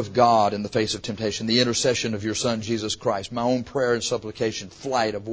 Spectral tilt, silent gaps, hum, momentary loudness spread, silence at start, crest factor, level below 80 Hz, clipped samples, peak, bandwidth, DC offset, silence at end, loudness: -4 dB/octave; none; none; 8 LU; 0 s; 20 dB; -52 dBFS; under 0.1%; -4 dBFS; 8 kHz; under 0.1%; 0 s; -24 LUFS